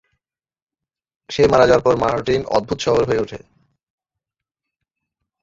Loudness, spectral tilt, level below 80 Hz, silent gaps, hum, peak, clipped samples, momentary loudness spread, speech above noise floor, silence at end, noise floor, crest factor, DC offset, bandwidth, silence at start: -17 LUFS; -5.5 dB/octave; -46 dBFS; none; none; -2 dBFS; under 0.1%; 13 LU; 71 dB; 2.05 s; -87 dBFS; 20 dB; under 0.1%; 7.8 kHz; 1.3 s